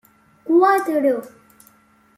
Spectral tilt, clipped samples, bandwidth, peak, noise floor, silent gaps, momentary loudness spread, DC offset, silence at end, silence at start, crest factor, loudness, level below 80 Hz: -5 dB/octave; under 0.1%; 15.5 kHz; -4 dBFS; -55 dBFS; none; 12 LU; under 0.1%; 0.9 s; 0.45 s; 16 dB; -18 LUFS; -72 dBFS